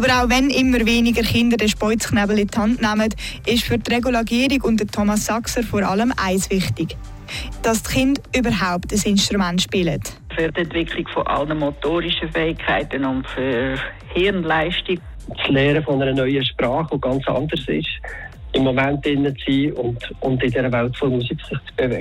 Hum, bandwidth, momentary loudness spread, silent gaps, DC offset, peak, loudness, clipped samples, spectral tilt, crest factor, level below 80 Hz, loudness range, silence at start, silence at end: none; 16.5 kHz; 9 LU; none; under 0.1%; -6 dBFS; -20 LUFS; under 0.1%; -4.5 dB/octave; 12 dB; -36 dBFS; 3 LU; 0 s; 0 s